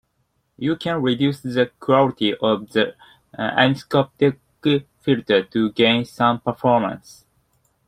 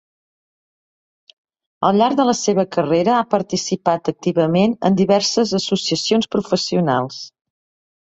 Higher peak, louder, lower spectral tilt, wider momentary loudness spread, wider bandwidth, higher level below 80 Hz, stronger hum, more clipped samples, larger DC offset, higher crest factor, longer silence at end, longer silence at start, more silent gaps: about the same, -2 dBFS vs -2 dBFS; about the same, -20 LUFS vs -18 LUFS; first, -6.5 dB/octave vs -5 dB/octave; first, 8 LU vs 5 LU; first, 15 kHz vs 8 kHz; about the same, -58 dBFS vs -58 dBFS; neither; neither; neither; about the same, 18 dB vs 18 dB; first, 0.9 s vs 0.75 s; second, 0.6 s vs 1.8 s; neither